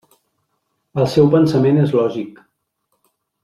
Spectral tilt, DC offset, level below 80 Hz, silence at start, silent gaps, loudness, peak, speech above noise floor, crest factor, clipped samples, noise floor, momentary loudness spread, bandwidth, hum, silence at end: -8.5 dB/octave; under 0.1%; -54 dBFS; 0.95 s; none; -15 LUFS; -2 dBFS; 56 dB; 16 dB; under 0.1%; -71 dBFS; 15 LU; 13 kHz; none; 1.15 s